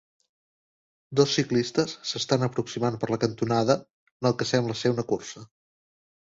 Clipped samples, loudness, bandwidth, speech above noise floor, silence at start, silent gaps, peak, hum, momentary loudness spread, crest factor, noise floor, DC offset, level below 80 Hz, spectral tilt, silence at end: under 0.1%; -26 LUFS; 8 kHz; over 64 dB; 1.1 s; 3.90-4.20 s; -6 dBFS; none; 7 LU; 20 dB; under -90 dBFS; under 0.1%; -62 dBFS; -5 dB/octave; 0.85 s